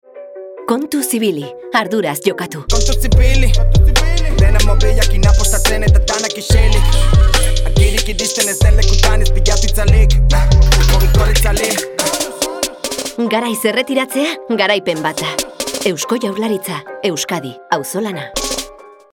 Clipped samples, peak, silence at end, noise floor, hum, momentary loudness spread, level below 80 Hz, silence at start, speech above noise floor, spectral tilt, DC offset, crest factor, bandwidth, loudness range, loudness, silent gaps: under 0.1%; 0 dBFS; 0.4 s; -35 dBFS; none; 8 LU; -14 dBFS; 0.15 s; 24 dB; -4 dB/octave; under 0.1%; 12 dB; 18 kHz; 5 LU; -15 LUFS; none